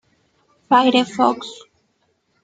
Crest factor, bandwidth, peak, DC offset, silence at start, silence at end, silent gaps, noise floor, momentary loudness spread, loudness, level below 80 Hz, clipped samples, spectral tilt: 18 dB; 9.2 kHz; -2 dBFS; under 0.1%; 0.7 s; 0.9 s; none; -66 dBFS; 15 LU; -17 LUFS; -68 dBFS; under 0.1%; -4 dB/octave